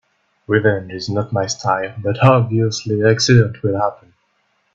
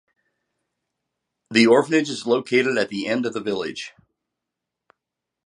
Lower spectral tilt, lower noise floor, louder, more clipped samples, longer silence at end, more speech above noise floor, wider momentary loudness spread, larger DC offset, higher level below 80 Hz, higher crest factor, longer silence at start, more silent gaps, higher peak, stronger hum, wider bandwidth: about the same, -5.5 dB/octave vs -4.5 dB/octave; second, -64 dBFS vs -84 dBFS; first, -17 LUFS vs -20 LUFS; neither; second, 0.8 s vs 1.55 s; second, 48 dB vs 64 dB; second, 10 LU vs 13 LU; neither; first, -50 dBFS vs -70 dBFS; about the same, 18 dB vs 22 dB; second, 0.5 s vs 1.5 s; neither; about the same, 0 dBFS vs -2 dBFS; neither; second, 7.6 kHz vs 11 kHz